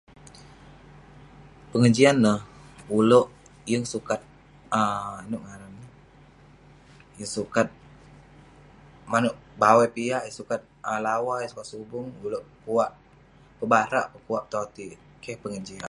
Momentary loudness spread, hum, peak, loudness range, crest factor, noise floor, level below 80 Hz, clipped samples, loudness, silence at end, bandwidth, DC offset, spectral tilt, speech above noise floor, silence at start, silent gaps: 19 LU; none; -4 dBFS; 10 LU; 24 dB; -54 dBFS; -58 dBFS; under 0.1%; -25 LUFS; 0 s; 11.5 kHz; under 0.1%; -5.5 dB/octave; 30 dB; 1.75 s; none